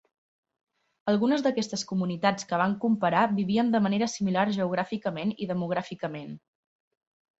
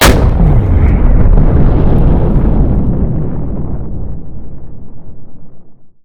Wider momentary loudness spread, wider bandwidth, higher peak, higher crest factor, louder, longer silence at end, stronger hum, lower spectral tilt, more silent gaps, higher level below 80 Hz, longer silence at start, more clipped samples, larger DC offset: second, 11 LU vs 19 LU; second, 8 kHz vs over 20 kHz; second, -8 dBFS vs 0 dBFS; first, 20 dB vs 10 dB; second, -27 LUFS vs -12 LUFS; first, 1 s vs 0.1 s; neither; about the same, -5.5 dB/octave vs -6 dB/octave; neither; second, -68 dBFS vs -12 dBFS; first, 1.05 s vs 0 s; second, under 0.1% vs 1%; neither